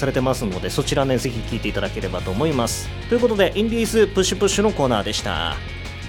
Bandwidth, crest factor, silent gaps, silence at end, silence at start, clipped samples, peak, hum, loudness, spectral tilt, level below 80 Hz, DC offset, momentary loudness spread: 18.5 kHz; 18 dB; none; 0 s; 0 s; under 0.1%; -4 dBFS; none; -21 LUFS; -4.5 dB/octave; -34 dBFS; under 0.1%; 7 LU